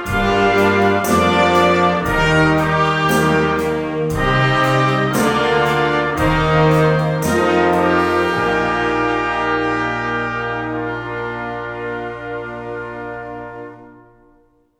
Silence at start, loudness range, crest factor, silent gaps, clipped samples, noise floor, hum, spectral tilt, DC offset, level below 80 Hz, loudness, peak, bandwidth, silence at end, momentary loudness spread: 0 s; 11 LU; 14 dB; none; under 0.1%; -54 dBFS; none; -5.5 dB/octave; under 0.1%; -36 dBFS; -16 LUFS; -2 dBFS; 19.5 kHz; 0.9 s; 13 LU